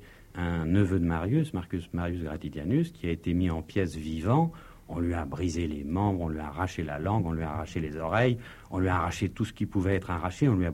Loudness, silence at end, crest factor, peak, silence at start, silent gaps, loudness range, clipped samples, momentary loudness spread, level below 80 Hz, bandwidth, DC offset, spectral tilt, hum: -30 LUFS; 0 s; 18 dB; -12 dBFS; 0 s; none; 2 LU; under 0.1%; 8 LU; -44 dBFS; 15 kHz; under 0.1%; -7.5 dB/octave; none